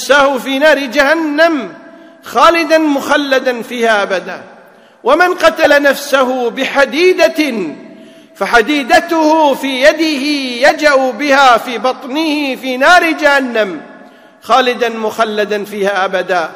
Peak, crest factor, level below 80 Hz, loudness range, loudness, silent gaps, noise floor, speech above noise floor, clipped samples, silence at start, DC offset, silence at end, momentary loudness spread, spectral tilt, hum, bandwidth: 0 dBFS; 12 dB; -48 dBFS; 2 LU; -11 LUFS; none; -41 dBFS; 30 dB; 1%; 0 s; under 0.1%; 0 s; 9 LU; -3 dB/octave; none; 16.5 kHz